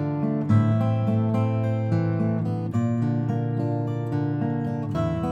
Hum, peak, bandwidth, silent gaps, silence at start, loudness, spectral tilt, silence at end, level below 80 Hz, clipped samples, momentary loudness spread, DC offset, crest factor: none; -8 dBFS; 7.2 kHz; none; 0 s; -24 LUFS; -10 dB/octave; 0 s; -52 dBFS; under 0.1%; 5 LU; under 0.1%; 14 dB